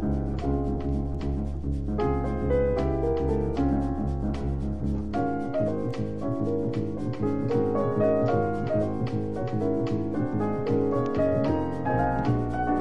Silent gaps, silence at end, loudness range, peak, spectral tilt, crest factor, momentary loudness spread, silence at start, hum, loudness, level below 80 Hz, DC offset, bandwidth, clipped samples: none; 0 s; 2 LU; -12 dBFS; -9.5 dB/octave; 14 dB; 6 LU; 0 s; none; -27 LUFS; -36 dBFS; 1%; 9.6 kHz; under 0.1%